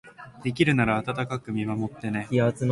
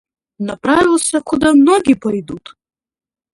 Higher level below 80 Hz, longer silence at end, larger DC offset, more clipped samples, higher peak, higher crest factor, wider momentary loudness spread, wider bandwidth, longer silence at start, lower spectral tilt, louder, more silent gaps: second, -54 dBFS vs -46 dBFS; second, 0 s vs 0.95 s; neither; neither; second, -8 dBFS vs 0 dBFS; about the same, 18 dB vs 14 dB; second, 10 LU vs 16 LU; about the same, 11.5 kHz vs 11.5 kHz; second, 0.05 s vs 0.4 s; first, -7 dB/octave vs -4 dB/octave; second, -26 LUFS vs -13 LUFS; neither